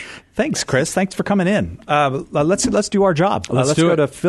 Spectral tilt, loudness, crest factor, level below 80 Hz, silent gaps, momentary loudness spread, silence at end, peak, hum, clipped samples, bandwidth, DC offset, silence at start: -5 dB/octave; -18 LUFS; 14 dB; -46 dBFS; none; 5 LU; 0 s; -2 dBFS; none; under 0.1%; 12.5 kHz; under 0.1%; 0 s